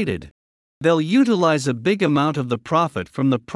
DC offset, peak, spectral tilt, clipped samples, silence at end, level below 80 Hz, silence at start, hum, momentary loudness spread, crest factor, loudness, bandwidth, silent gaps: under 0.1%; -4 dBFS; -6.5 dB/octave; under 0.1%; 0 s; -56 dBFS; 0 s; none; 7 LU; 16 dB; -19 LUFS; 12 kHz; 0.31-0.81 s